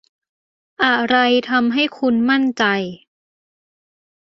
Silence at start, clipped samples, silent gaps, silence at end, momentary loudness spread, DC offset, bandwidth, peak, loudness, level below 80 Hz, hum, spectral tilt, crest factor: 0.8 s; under 0.1%; none; 1.35 s; 4 LU; under 0.1%; 7 kHz; -2 dBFS; -17 LUFS; -62 dBFS; none; -5 dB/octave; 18 dB